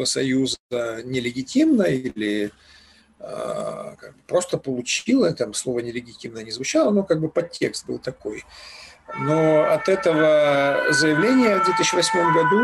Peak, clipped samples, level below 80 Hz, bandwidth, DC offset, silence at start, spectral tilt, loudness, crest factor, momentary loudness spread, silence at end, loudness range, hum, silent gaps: -8 dBFS; under 0.1%; -58 dBFS; 12.5 kHz; under 0.1%; 0 s; -4 dB/octave; -21 LUFS; 12 dB; 17 LU; 0 s; 7 LU; none; 0.60-0.69 s